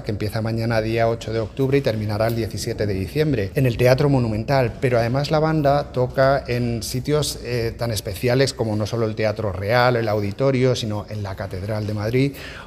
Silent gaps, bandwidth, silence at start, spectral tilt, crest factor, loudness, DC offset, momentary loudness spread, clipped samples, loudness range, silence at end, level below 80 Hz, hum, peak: none; 15.5 kHz; 0 s; -6 dB/octave; 18 dB; -21 LUFS; under 0.1%; 7 LU; under 0.1%; 3 LU; 0 s; -40 dBFS; none; -2 dBFS